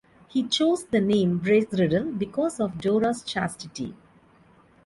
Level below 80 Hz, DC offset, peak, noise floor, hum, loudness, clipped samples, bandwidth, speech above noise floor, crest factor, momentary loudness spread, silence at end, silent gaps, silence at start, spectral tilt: -58 dBFS; under 0.1%; -10 dBFS; -57 dBFS; none; -25 LUFS; under 0.1%; 11.5 kHz; 33 dB; 16 dB; 10 LU; 0.9 s; none; 0.35 s; -5.5 dB/octave